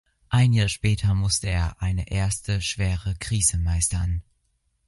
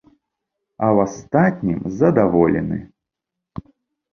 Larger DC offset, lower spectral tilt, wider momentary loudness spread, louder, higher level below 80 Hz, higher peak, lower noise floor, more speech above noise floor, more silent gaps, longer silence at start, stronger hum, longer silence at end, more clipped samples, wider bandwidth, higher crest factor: neither; second, -4 dB/octave vs -9 dB/octave; second, 7 LU vs 22 LU; second, -24 LUFS vs -18 LUFS; first, -32 dBFS vs -46 dBFS; second, -6 dBFS vs -2 dBFS; second, -70 dBFS vs -83 dBFS; second, 48 dB vs 66 dB; neither; second, 0.3 s vs 0.8 s; neither; second, 0.65 s vs 1.3 s; neither; first, 11.5 kHz vs 7 kHz; about the same, 16 dB vs 18 dB